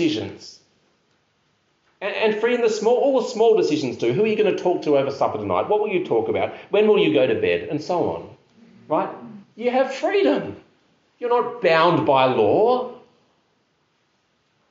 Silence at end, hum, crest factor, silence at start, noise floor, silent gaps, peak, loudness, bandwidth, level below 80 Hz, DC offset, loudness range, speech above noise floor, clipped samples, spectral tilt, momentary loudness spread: 1.7 s; none; 18 dB; 0 s; -67 dBFS; none; -4 dBFS; -20 LUFS; 7.8 kHz; -66 dBFS; under 0.1%; 4 LU; 47 dB; under 0.1%; -4 dB/octave; 11 LU